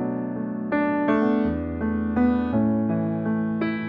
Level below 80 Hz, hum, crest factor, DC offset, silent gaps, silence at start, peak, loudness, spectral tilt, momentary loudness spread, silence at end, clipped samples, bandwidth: -44 dBFS; none; 14 dB; under 0.1%; none; 0 s; -10 dBFS; -24 LUFS; -10 dB/octave; 6 LU; 0 s; under 0.1%; 5 kHz